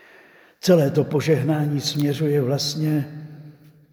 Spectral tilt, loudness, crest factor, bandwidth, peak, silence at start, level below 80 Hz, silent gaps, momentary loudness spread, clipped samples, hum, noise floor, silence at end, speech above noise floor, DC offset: -6 dB/octave; -21 LUFS; 18 dB; over 20 kHz; -4 dBFS; 0.65 s; -66 dBFS; none; 9 LU; under 0.1%; none; -51 dBFS; 0.4 s; 31 dB; under 0.1%